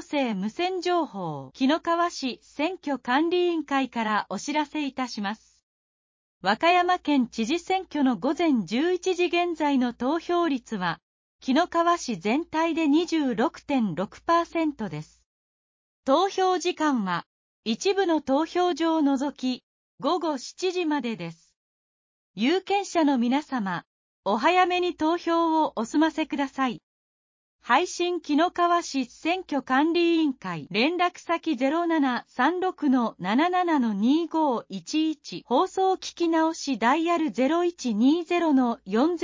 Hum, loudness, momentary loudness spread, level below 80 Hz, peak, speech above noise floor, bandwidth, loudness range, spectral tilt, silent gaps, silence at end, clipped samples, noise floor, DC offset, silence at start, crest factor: none; -25 LUFS; 8 LU; -66 dBFS; -8 dBFS; over 65 dB; 7.6 kHz; 3 LU; -4.5 dB/octave; 5.63-6.41 s, 11.02-11.39 s, 15.26-16.03 s, 17.26-17.63 s, 19.63-19.98 s, 21.56-22.34 s, 23.86-24.23 s, 26.83-27.59 s; 0 s; under 0.1%; under -90 dBFS; under 0.1%; 0 s; 18 dB